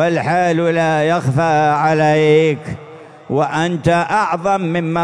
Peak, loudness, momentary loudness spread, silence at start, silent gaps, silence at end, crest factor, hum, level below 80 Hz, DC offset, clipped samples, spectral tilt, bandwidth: -2 dBFS; -15 LUFS; 6 LU; 0 s; none; 0 s; 14 dB; none; -50 dBFS; 0.2%; under 0.1%; -6.5 dB/octave; 11 kHz